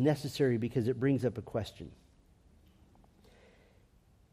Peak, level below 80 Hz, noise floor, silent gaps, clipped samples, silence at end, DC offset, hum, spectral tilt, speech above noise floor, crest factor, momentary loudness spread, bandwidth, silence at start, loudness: -16 dBFS; -64 dBFS; -65 dBFS; none; under 0.1%; 2.4 s; under 0.1%; none; -7.5 dB/octave; 33 dB; 20 dB; 15 LU; 15 kHz; 0 s; -33 LUFS